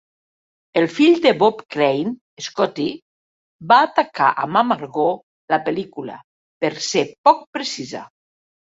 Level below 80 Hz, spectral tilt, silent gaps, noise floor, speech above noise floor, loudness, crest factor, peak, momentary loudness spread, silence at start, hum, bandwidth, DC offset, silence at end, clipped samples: -66 dBFS; -4.5 dB/octave; 2.21-2.37 s, 3.02-3.59 s, 5.23-5.48 s, 6.24-6.61 s, 7.18-7.24 s, 7.47-7.53 s; under -90 dBFS; over 72 dB; -19 LUFS; 18 dB; -2 dBFS; 16 LU; 0.75 s; none; 8 kHz; under 0.1%; 0.65 s; under 0.1%